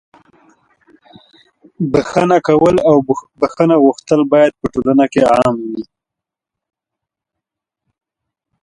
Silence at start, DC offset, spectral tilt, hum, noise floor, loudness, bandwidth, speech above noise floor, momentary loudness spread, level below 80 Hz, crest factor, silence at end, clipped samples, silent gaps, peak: 1.8 s; under 0.1%; -7 dB/octave; none; -84 dBFS; -13 LUFS; 11 kHz; 71 dB; 10 LU; -48 dBFS; 16 dB; 2.8 s; under 0.1%; none; 0 dBFS